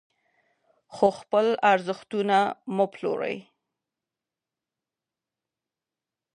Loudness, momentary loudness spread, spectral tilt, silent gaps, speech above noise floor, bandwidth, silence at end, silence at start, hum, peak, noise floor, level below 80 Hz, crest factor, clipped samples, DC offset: -25 LUFS; 9 LU; -5.5 dB/octave; none; 65 dB; 10.5 kHz; 2.95 s; 0.9 s; none; -6 dBFS; -89 dBFS; -76 dBFS; 22 dB; under 0.1%; under 0.1%